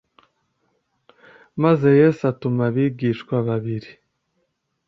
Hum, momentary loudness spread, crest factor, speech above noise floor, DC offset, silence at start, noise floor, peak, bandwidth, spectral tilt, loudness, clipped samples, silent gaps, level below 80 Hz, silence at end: none; 13 LU; 18 dB; 53 dB; under 0.1%; 1.55 s; -72 dBFS; -4 dBFS; 7.2 kHz; -9.5 dB/octave; -20 LUFS; under 0.1%; none; -62 dBFS; 0.95 s